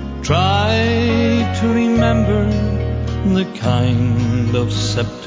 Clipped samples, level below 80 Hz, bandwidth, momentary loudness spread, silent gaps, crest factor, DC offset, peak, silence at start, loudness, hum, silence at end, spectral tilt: under 0.1%; -26 dBFS; 7.8 kHz; 4 LU; none; 16 dB; under 0.1%; 0 dBFS; 0 s; -16 LUFS; none; 0 s; -6.5 dB/octave